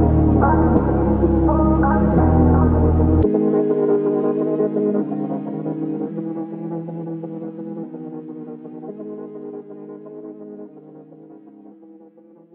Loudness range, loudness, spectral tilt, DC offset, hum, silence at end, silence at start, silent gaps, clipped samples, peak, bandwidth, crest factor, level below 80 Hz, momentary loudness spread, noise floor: 19 LU; -18 LUFS; -11.5 dB/octave; under 0.1%; none; 0.7 s; 0 s; none; under 0.1%; -4 dBFS; 3.1 kHz; 16 dB; -28 dBFS; 20 LU; -47 dBFS